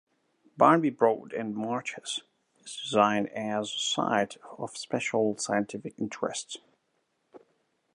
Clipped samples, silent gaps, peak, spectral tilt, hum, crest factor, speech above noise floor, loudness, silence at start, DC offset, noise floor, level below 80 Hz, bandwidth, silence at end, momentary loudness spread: under 0.1%; none; -6 dBFS; -4 dB/octave; none; 24 dB; 47 dB; -28 LUFS; 0.55 s; under 0.1%; -76 dBFS; -76 dBFS; 11.5 kHz; 0.6 s; 14 LU